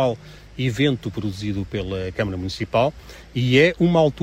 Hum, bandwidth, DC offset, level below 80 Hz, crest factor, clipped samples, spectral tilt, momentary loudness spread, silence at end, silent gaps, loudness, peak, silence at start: none; 15 kHz; under 0.1%; -44 dBFS; 18 dB; under 0.1%; -6.5 dB/octave; 12 LU; 0 s; none; -22 LUFS; -4 dBFS; 0 s